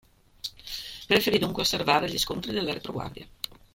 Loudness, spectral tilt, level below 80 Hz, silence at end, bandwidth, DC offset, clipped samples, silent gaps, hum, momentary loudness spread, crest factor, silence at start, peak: -26 LUFS; -3.5 dB/octave; -52 dBFS; 0.45 s; 16.5 kHz; under 0.1%; under 0.1%; none; none; 16 LU; 22 dB; 0.45 s; -6 dBFS